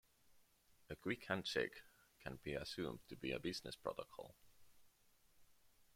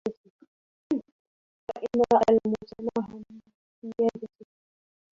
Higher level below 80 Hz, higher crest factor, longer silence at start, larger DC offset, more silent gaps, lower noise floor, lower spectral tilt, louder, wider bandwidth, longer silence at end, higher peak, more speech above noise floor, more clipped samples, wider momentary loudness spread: second, -72 dBFS vs -64 dBFS; about the same, 24 dB vs 22 dB; first, 0.3 s vs 0.05 s; neither; second, none vs 0.17-0.24 s, 0.30-0.39 s, 0.47-0.90 s, 1.12-1.67 s, 3.54-3.82 s; second, -73 dBFS vs under -90 dBFS; second, -4.5 dB/octave vs -7 dB/octave; second, -46 LUFS vs -27 LUFS; first, 16.5 kHz vs 7.6 kHz; second, 0.15 s vs 0.9 s; second, -26 dBFS vs -8 dBFS; second, 27 dB vs over 66 dB; neither; second, 14 LU vs 22 LU